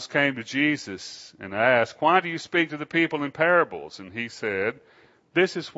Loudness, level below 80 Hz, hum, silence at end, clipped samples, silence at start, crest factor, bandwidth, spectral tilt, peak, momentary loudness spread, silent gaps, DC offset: -24 LUFS; -70 dBFS; none; 0 s; under 0.1%; 0 s; 22 dB; 8 kHz; -5 dB/octave; -4 dBFS; 15 LU; none; under 0.1%